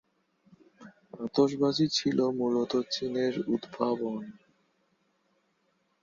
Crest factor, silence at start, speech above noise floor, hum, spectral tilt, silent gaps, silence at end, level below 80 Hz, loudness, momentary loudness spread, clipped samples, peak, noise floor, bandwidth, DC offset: 20 dB; 0.8 s; 45 dB; none; -5.5 dB/octave; none; 1.7 s; -70 dBFS; -29 LUFS; 12 LU; under 0.1%; -10 dBFS; -74 dBFS; 7.6 kHz; under 0.1%